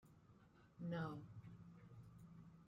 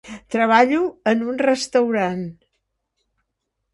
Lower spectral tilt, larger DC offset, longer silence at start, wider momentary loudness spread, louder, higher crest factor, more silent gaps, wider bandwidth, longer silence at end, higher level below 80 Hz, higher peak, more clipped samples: first, -8 dB/octave vs -5 dB/octave; neither; about the same, 0 s vs 0.05 s; first, 22 LU vs 11 LU; second, -54 LUFS vs -19 LUFS; about the same, 18 dB vs 20 dB; neither; second, 7.6 kHz vs 11.5 kHz; second, 0 s vs 1.4 s; second, -78 dBFS vs -62 dBFS; second, -36 dBFS vs -2 dBFS; neither